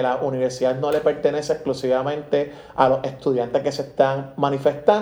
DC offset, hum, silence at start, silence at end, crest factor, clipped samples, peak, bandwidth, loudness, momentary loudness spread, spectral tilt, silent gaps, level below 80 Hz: under 0.1%; none; 0 s; 0 s; 20 dB; under 0.1%; 0 dBFS; over 20 kHz; -22 LUFS; 5 LU; -6 dB/octave; none; -56 dBFS